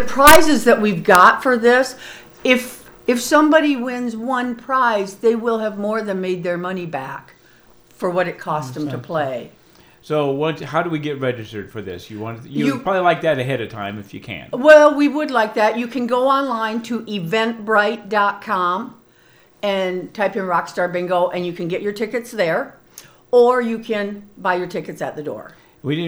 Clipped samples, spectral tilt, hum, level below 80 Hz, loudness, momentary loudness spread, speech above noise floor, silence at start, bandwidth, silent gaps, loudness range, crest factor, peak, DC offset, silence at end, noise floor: 0.1%; -4.5 dB/octave; none; -48 dBFS; -18 LUFS; 16 LU; 34 dB; 0 s; over 20 kHz; none; 8 LU; 18 dB; 0 dBFS; under 0.1%; 0 s; -52 dBFS